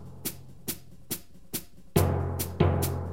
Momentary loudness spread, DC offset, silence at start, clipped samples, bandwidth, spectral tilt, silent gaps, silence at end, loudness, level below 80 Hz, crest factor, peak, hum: 11 LU; 0.5%; 0 s; under 0.1%; 16.5 kHz; -5.5 dB/octave; none; 0 s; -31 LUFS; -46 dBFS; 22 dB; -10 dBFS; none